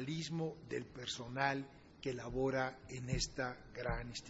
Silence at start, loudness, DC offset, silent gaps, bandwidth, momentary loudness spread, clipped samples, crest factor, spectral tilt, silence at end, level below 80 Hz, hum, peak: 0 s; -41 LUFS; under 0.1%; none; 7.6 kHz; 8 LU; under 0.1%; 22 dB; -4 dB/octave; 0 s; -54 dBFS; none; -18 dBFS